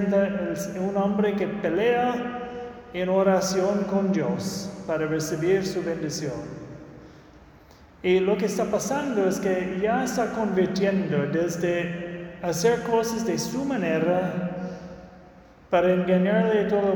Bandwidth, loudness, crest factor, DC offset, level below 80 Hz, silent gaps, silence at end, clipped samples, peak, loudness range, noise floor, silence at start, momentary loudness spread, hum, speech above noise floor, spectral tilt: 19 kHz; -25 LUFS; 16 dB; under 0.1%; -56 dBFS; none; 0 s; under 0.1%; -8 dBFS; 4 LU; -51 dBFS; 0 s; 12 LU; none; 27 dB; -5.5 dB/octave